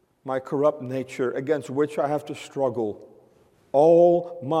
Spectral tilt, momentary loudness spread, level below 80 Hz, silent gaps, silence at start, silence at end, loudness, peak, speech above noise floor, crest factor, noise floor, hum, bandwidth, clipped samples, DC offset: -7 dB/octave; 14 LU; -72 dBFS; none; 0.25 s; 0 s; -23 LUFS; -6 dBFS; 36 dB; 16 dB; -59 dBFS; none; 11 kHz; under 0.1%; under 0.1%